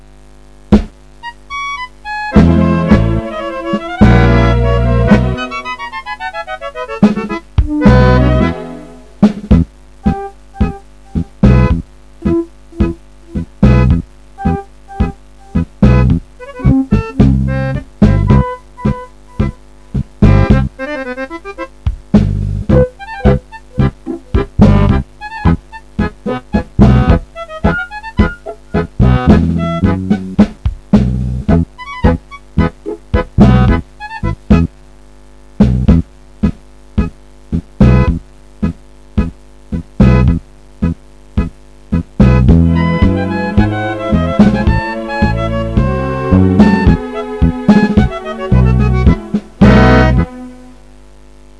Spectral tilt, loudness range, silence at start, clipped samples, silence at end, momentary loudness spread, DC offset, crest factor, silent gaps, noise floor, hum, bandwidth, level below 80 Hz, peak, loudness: -8.5 dB/octave; 4 LU; 0.7 s; 0.7%; 1.05 s; 14 LU; 0.9%; 12 dB; none; -40 dBFS; none; 9.8 kHz; -18 dBFS; 0 dBFS; -13 LUFS